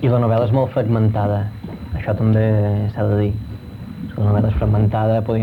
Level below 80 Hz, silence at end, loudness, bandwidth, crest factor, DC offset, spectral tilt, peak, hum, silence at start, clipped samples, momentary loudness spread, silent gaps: -34 dBFS; 0 s; -18 LUFS; 4.3 kHz; 12 dB; under 0.1%; -10.5 dB/octave; -4 dBFS; none; 0 s; under 0.1%; 13 LU; none